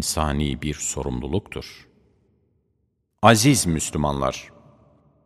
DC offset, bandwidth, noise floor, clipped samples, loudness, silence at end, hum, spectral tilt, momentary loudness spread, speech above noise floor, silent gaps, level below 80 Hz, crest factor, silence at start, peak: under 0.1%; 15.5 kHz; -71 dBFS; under 0.1%; -21 LUFS; 0.75 s; none; -4.5 dB/octave; 19 LU; 49 dB; none; -38 dBFS; 24 dB; 0 s; 0 dBFS